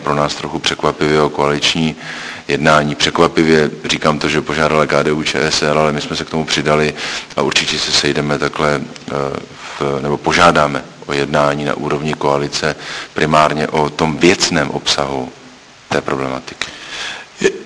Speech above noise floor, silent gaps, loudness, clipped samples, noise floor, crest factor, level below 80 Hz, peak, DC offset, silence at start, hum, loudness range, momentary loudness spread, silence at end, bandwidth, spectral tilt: 25 dB; none; -15 LUFS; under 0.1%; -40 dBFS; 16 dB; -42 dBFS; 0 dBFS; under 0.1%; 0 s; none; 3 LU; 11 LU; 0 s; 11 kHz; -4 dB/octave